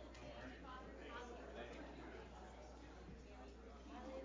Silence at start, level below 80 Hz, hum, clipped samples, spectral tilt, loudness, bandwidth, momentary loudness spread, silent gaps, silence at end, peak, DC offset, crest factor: 0 s; -62 dBFS; none; under 0.1%; -5.5 dB/octave; -56 LUFS; 7.6 kHz; 5 LU; none; 0 s; -40 dBFS; under 0.1%; 14 dB